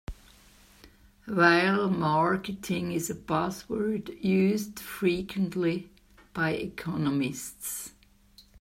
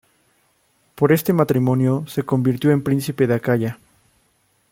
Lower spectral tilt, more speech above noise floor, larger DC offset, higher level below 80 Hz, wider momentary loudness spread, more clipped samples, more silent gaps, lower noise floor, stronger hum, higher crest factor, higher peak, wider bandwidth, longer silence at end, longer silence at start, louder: second, -5.5 dB/octave vs -7.5 dB/octave; second, 30 dB vs 45 dB; neither; about the same, -56 dBFS vs -58 dBFS; first, 13 LU vs 5 LU; neither; neither; second, -58 dBFS vs -63 dBFS; neither; about the same, 22 dB vs 18 dB; second, -6 dBFS vs -2 dBFS; about the same, 16 kHz vs 17 kHz; second, 0 s vs 0.95 s; second, 0.1 s vs 0.95 s; second, -28 LUFS vs -19 LUFS